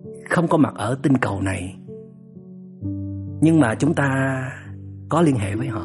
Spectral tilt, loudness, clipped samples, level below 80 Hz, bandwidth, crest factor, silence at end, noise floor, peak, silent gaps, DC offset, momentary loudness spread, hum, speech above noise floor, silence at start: -7 dB/octave; -21 LUFS; under 0.1%; -56 dBFS; 11.5 kHz; 16 dB; 0 s; -41 dBFS; -4 dBFS; none; under 0.1%; 21 LU; none; 22 dB; 0.05 s